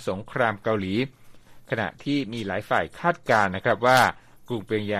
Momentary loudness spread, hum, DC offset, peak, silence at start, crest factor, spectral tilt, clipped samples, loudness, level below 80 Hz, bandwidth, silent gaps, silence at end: 11 LU; none; under 0.1%; -6 dBFS; 0 s; 20 dB; -5.5 dB/octave; under 0.1%; -24 LUFS; -58 dBFS; 15 kHz; none; 0 s